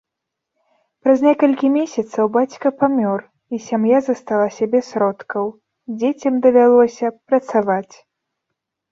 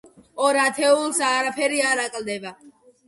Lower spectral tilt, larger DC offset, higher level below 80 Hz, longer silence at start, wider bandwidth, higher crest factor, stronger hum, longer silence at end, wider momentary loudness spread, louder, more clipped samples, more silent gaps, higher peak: first, -6.5 dB/octave vs -1.5 dB/octave; neither; about the same, -66 dBFS vs -70 dBFS; first, 1.05 s vs 0.35 s; second, 7.4 kHz vs 12 kHz; about the same, 16 dB vs 16 dB; neither; first, 1.1 s vs 0.4 s; about the same, 11 LU vs 13 LU; first, -17 LUFS vs -21 LUFS; neither; neither; first, -2 dBFS vs -6 dBFS